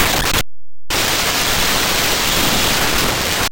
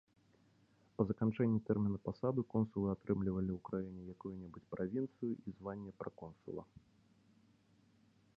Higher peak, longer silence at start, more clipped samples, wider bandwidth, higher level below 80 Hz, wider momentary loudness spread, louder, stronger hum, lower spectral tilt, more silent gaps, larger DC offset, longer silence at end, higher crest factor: first, -2 dBFS vs -18 dBFS; second, 0 s vs 1 s; neither; first, 17.5 kHz vs 5.2 kHz; first, -30 dBFS vs -64 dBFS; second, 4 LU vs 14 LU; first, -15 LUFS vs -40 LUFS; neither; second, -1.5 dB/octave vs -10 dB/octave; neither; neither; second, 0 s vs 1.75 s; second, 14 dB vs 22 dB